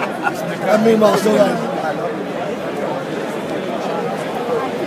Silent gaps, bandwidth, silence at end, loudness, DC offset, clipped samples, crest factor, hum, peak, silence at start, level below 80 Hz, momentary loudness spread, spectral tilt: none; 15.5 kHz; 0 s; -18 LUFS; under 0.1%; under 0.1%; 18 dB; none; 0 dBFS; 0 s; -60 dBFS; 10 LU; -5.5 dB/octave